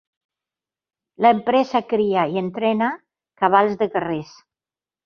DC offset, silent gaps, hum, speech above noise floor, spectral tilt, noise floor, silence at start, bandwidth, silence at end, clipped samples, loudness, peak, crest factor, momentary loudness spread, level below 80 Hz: under 0.1%; none; none; over 71 dB; -7 dB/octave; under -90 dBFS; 1.2 s; 6.8 kHz; 0.8 s; under 0.1%; -20 LUFS; -2 dBFS; 20 dB; 8 LU; -64 dBFS